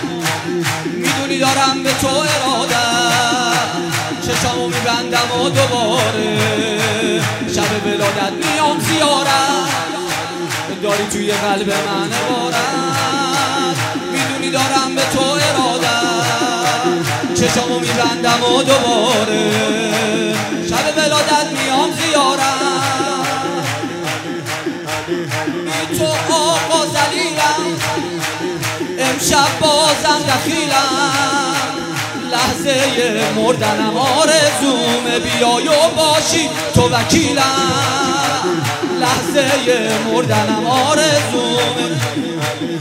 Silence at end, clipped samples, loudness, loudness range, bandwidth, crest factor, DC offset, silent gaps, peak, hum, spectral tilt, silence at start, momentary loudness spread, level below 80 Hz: 0 s; under 0.1%; -15 LUFS; 3 LU; 16.5 kHz; 16 dB; under 0.1%; none; 0 dBFS; none; -3 dB/octave; 0 s; 7 LU; -48 dBFS